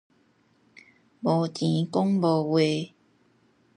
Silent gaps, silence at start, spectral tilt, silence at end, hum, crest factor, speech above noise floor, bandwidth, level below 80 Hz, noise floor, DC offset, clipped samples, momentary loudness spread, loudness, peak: none; 1.2 s; -7 dB/octave; 0.9 s; none; 18 dB; 41 dB; 10.5 kHz; -74 dBFS; -65 dBFS; under 0.1%; under 0.1%; 9 LU; -25 LUFS; -10 dBFS